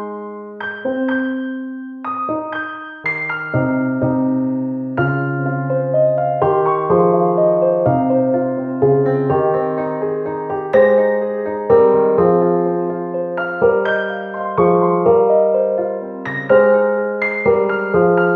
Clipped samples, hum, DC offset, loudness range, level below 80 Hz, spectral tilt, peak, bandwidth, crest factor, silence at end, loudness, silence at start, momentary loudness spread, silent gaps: under 0.1%; none; under 0.1%; 5 LU; -52 dBFS; -10 dB/octave; 0 dBFS; 4.5 kHz; 16 dB; 0 s; -16 LUFS; 0 s; 11 LU; none